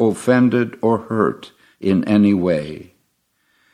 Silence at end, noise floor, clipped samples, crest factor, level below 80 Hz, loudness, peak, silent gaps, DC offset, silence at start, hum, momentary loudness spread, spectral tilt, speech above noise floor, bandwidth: 0.9 s; -66 dBFS; under 0.1%; 16 dB; -58 dBFS; -17 LUFS; -2 dBFS; none; under 0.1%; 0 s; none; 13 LU; -7.5 dB/octave; 49 dB; 12 kHz